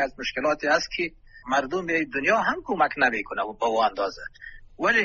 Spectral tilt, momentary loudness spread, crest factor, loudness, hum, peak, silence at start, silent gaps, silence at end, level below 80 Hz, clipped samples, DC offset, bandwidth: -1.5 dB/octave; 13 LU; 18 dB; -25 LUFS; none; -6 dBFS; 0 s; none; 0 s; -52 dBFS; under 0.1%; under 0.1%; 7.2 kHz